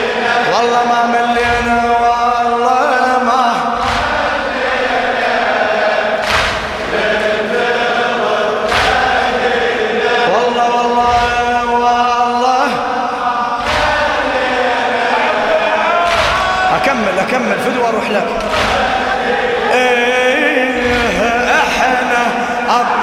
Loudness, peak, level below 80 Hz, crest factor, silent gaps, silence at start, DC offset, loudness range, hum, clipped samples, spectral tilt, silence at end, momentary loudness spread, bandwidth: -13 LUFS; 0 dBFS; -36 dBFS; 12 dB; none; 0 s; under 0.1%; 2 LU; none; under 0.1%; -3.5 dB/octave; 0 s; 3 LU; 15 kHz